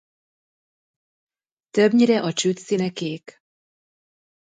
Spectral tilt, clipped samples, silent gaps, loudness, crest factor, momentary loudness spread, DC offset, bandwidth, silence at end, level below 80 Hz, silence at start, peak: -5 dB/octave; under 0.1%; none; -21 LUFS; 18 dB; 13 LU; under 0.1%; 9.4 kHz; 1.3 s; -72 dBFS; 1.75 s; -6 dBFS